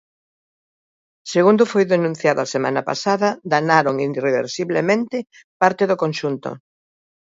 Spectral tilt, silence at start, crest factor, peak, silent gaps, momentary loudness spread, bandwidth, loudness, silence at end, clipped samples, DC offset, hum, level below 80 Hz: -5.5 dB/octave; 1.25 s; 20 dB; 0 dBFS; 5.44-5.60 s; 11 LU; 7.8 kHz; -19 LUFS; 0.7 s; under 0.1%; under 0.1%; none; -68 dBFS